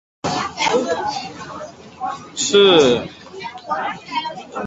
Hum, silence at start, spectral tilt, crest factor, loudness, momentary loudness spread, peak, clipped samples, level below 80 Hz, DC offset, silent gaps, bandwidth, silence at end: none; 0.25 s; -3 dB/octave; 18 dB; -18 LUFS; 21 LU; -2 dBFS; under 0.1%; -54 dBFS; under 0.1%; none; 8 kHz; 0 s